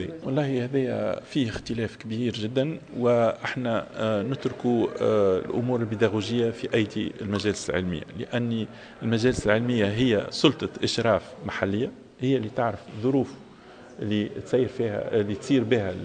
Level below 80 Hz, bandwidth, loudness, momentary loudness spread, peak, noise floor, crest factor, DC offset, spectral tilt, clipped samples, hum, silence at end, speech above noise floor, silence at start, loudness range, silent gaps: -54 dBFS; 9.8 kHz; -26 LUFS; 8 LU; -4 dBFS; -47 dBFS; 22 dB; under 0.1%; -6 dB/octave; under 0.1%; none; 0 s; 22 dB; 0 s; 3 LU; none